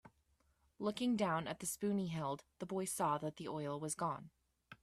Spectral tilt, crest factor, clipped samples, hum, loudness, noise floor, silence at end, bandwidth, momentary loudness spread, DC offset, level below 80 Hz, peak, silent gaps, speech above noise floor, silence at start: -5 dB/octave; 18 dB; under 0.1%; none; -40 LUFS; -77 dBFS; 0.05 s; 15 kHz; 7 LU; under 0.1%; -74 dBFS; -24 dBFS; none; 37 dB; 0.05 s